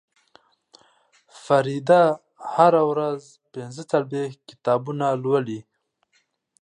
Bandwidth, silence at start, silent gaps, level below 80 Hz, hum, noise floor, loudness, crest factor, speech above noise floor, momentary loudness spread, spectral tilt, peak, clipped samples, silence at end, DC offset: 10.5 kHz; 1.35 s; none; -76 dBFS; none; -68 dBFS; -22 LUFS; 22 dB; 47 dB; 18 LU; -6.5 dB/octave; -2 dBFS; under 0.1%; 1 s; under 0.1%